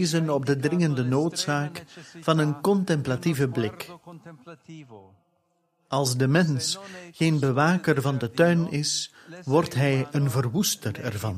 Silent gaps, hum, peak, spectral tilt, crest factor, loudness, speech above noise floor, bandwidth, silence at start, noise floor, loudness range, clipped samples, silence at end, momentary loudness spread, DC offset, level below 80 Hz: none; none; -6 dBFS; -5.5 dB/octave; 18 dB; -24 LUFS; 46 dB; 15.5 kHz; 0 s; -71 dBFS; 5 LU; under 0.1%; 0 s; 18 LU; under 0.1%; -62 dBFS